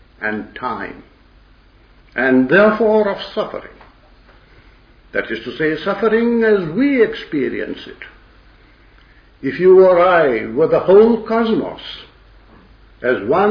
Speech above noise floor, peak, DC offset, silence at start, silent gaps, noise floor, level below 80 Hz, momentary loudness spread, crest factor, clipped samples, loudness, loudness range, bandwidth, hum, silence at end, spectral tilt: 33 dB; 0 dBFS; under 0.1%; 0.2 s; none; -48 dBFS; -48 dBFS; 17 LU; 16 dB; under 0.1%; -15 LUFS; 7 LU; 5.4 kHz; none; 0 s; -8 dB/octave